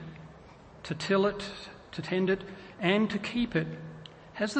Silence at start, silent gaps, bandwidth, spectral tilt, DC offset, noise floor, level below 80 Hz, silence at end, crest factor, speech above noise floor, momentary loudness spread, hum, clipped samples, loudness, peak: 0 s; none; 8.8 kHz; -6 dB/octave; under 0.1%; -52 dBFS; -58 dBFS; 0 s; 20 dB; 22 dB; 19 LU; none; under 0.1%; -30 LUFS; -12 dBFS